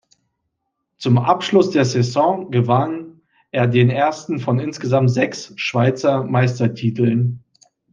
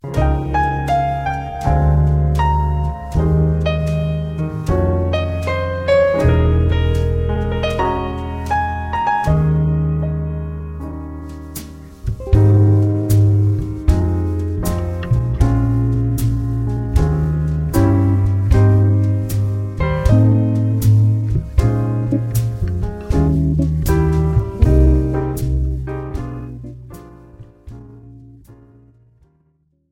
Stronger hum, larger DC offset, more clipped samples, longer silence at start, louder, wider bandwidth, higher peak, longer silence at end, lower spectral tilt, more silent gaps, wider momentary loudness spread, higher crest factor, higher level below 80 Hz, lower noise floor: neither; neither; neither; first, 1 s vs 0.05 s; about the same, -18 LUFS vs -17 LUFS; second, 7.4 kHz vs 16.5 kHz; about the same, -2 dBFS vs 0 dBFS; second, 0.55 s vs 1.4 s; about the same, -7 dB/octave vs -8 dB/octave; neither; second, 9 LU vs 12 LU; about the same, 18 dB vs 16 dB; second, -62 dBFS vs -22 dBFS; first, -75 dBFS vs -61 dBFS